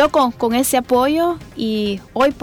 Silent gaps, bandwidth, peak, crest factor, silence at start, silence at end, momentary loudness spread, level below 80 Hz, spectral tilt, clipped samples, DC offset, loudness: none; 19.5 kHz; -2 dBFS; 16 dB; 0 s; 0 s; 7 LU; -46 dBFS; -4 dB/octave; under 0.1%; under 0.1%; -18 LUFS